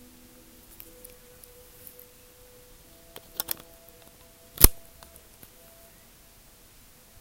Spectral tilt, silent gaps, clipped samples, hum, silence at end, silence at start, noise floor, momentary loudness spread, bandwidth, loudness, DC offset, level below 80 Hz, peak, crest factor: -2.5 dB/octave; none; under 0.1%; none; 2.45 s; 4.6 s; -54 dBFS; 32 LU; 17 kHz; -23 LUFS; under 0.1%; -36 dBFS; 0 dBFS; 32 dB